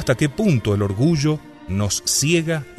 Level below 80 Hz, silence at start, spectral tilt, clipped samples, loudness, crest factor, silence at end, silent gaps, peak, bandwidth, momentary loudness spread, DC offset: -44 dBFS; 0 s; -4.5 dB/octave; under 0.1%; -19 LUFS; 16 dB; 0.05 s; none; -4 dBFS; 14.5 kHz; 7 LU; 0.1%